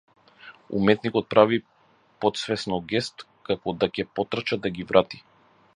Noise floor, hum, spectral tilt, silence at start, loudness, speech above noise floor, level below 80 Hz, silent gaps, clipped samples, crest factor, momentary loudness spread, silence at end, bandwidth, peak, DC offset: -50 dBFS; none; -5.5 dB/octave; 0.45 s; -25 LUFS; 26 dB; -58 dBFS; none; under 0.1%; 24 dB; 11 LU; 0.55 s; 11 kHz; -2 dBFS; under 0.1%